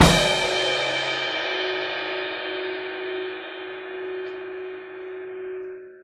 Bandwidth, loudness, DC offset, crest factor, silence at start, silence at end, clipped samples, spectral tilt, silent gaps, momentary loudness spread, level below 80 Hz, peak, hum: 16 kHz; -26 LUFS; under 0.1%; 26 dB; 0 s; 0 s; under 0.1%; -3.5 dB/octave; none; 14 LU; -42 dBFS; 0 dBFS; none